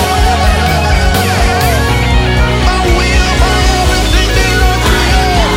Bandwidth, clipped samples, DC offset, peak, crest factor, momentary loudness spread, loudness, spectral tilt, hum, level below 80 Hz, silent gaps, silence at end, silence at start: 16.5 kHz; under 0.1%; under 0.1%; 0 dBFS; 10 dB; 1 LU; -10 LUFS; -4.5 dB/octave; none; -12 dBFS; none; 0 s; 0 s